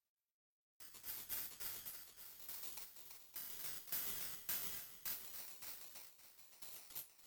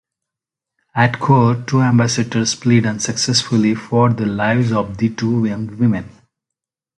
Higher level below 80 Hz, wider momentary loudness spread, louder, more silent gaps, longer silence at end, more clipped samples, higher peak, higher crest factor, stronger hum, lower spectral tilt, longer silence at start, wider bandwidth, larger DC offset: second, -80 dBFS vs -50 dBFS; first, 13 LU vs 6 LU; second, -46 LUFS vs -16 LUFS; neither; second, 0 s vs 0.9 s; neither; second, -28 dBFS vs 0 dBFS; first, 22 dB vs 16 dB; neither; second, 0 dB/octave vs -5 dB/octave; second, 0.8 s vs 0.95 s; first, 19.5 kHz vs 11.5 kHz; neither